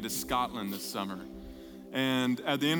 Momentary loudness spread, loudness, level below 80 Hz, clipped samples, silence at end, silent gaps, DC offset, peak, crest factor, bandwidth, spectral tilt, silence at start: 18 LU; -32 LUFS; -56 dBFS; under 0.1%; 0 s; none; under 0.1%; -16 dBFS; 18 dB; 19.5 kHz; -4 dB/octave; 0 s